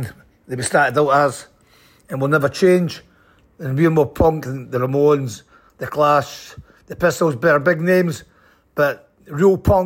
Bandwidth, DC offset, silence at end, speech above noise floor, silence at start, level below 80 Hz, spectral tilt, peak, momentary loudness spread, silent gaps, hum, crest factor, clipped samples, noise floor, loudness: 16.5 kHz; under 0.1%; 0 s; 37 dB; 0 s; -40 dBFS; -6 dB/octave; -4 dBFS; 17 LU; none; none; 14 dB; under 0.1%; -54 dBFS; -17 LUFS